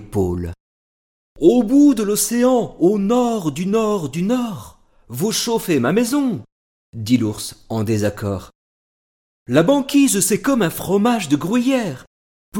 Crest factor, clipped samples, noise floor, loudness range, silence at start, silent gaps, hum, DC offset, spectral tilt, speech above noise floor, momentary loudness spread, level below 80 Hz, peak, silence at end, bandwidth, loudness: 16 dB; under 0.1%; under -90 dBFS; 5 LU; 0 s; 0.60-1.36 s, 6.52-6.93 s, 8.55-9.46 s, 12.07-12.52 s; none; under 0.1%; -5 dB/octave; over 73 dB; 13 LU; -48 dBFS; -2 dBFS; 0 s; 17.5 kHz; -18 LUFS